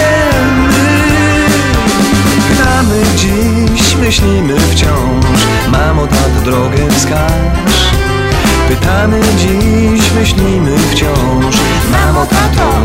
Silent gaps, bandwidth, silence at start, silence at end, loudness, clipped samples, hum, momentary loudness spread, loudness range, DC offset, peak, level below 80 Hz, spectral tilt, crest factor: none; 16.5 kHz; 0 s; 0 s; -9 LUFS; under 0.1%; none; 2 LU; 1 LU; under 0.1%; 0 dBFS; -16 dBFS; -5 dB/octave; 8 dB